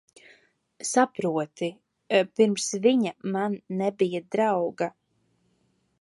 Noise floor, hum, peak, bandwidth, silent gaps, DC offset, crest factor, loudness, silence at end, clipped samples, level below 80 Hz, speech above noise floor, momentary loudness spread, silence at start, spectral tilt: -70 dBFS; none; -8 dBFS; 11.5 kHz; none; under 0.1%; 20 dB; -26 LUFS; 1.1 s; under 0.1%; -76 dBFS; 45 dB; 10 LU; 0.8 s; -4.5 dB/octave